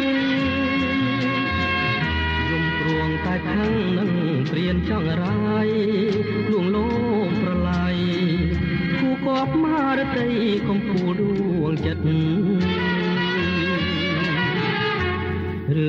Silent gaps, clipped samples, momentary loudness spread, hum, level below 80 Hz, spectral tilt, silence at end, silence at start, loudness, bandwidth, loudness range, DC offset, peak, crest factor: none; under 0.1%; 2 LU; none; -38 dBFS; -7.5 dB/octave; 0 s; 0 s; -22 LUFS; 7 kHz; 1 LU; under 0.1%; -12 dBFS; 10 dB